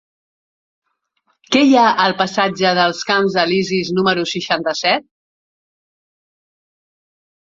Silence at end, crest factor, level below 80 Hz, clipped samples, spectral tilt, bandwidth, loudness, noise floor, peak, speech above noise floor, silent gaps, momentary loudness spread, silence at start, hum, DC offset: 2.45 s; 18 dB; -62 dBFS; under 0.1%; -4.5 dB/octave; 7.8 kHz; -15 LUFS; -66 dBFS; 0 dBFS; 51 dB; none; 7 LU; 1.5 s; none; under 0.1%